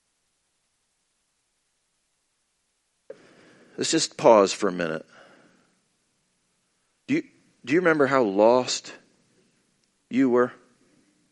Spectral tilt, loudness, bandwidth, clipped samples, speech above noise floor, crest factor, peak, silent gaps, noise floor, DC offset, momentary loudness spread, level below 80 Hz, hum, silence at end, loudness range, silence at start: -4 dB/octave; -22 LUFS; 11.5 kHz; under 0.1%; 52 dB; 24 dB; -4 dBFS; none; -74 dBFS; under 0.1%; 13 LU; -74 dBFS; none; 0.8 s; 7 LU; 3.8 s